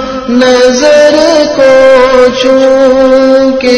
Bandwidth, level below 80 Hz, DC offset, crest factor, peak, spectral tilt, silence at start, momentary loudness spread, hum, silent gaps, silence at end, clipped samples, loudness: 11 kHz; -34 dBFS; under 0.1%; 4 dB; 0 dBFS; -3.5 dB/octave; 0 s; 3 LU; none; none; 0 s; 10%; -5 LUFS